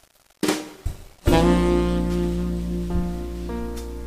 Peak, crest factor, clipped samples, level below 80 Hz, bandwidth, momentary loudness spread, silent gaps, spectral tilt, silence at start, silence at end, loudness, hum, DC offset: -2 dBFS; 20 dB; under 0.1%; -30 dBFS; 15.5 kHz; 13 LU; none; -6.5 dB/octave; 0.45 s; 0 s; -24 LUFS; none; under 0.1%